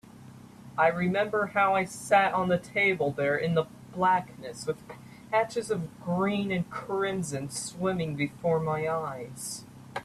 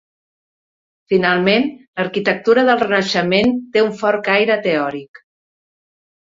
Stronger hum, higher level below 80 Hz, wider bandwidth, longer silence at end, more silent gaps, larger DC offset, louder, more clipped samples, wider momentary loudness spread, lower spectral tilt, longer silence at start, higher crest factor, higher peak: neither; second, -64 dBFS vs -58 dBFS; first, 14 kHz vs 7.8 kHz; second, 0 s vs 1.35 s; second, none vs 1.88-1.93 s; neither; second, -28 LUFS vs -16 LUFS; neither; first, 12 LU vs 8 LU; about the same, -5 dB/octave vs -5.5 dB/octave; second, 0.05 s vs 1.1 s; about the same, 18 dB vs 16 dB; second, -10 dBFS vs -2 dBFS